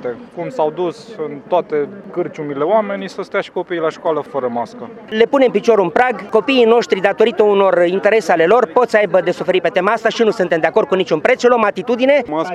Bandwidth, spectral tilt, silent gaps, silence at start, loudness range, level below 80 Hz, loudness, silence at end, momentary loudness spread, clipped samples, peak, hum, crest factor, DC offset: 10.5 kHz; -5.5 dB/octave; none; 0 s; 7 LU; -60 dBFS; -15 LUFS; 0 s; 11 LU; under 0.1%; 0 dBFS; none; 14 dB; under 0.1%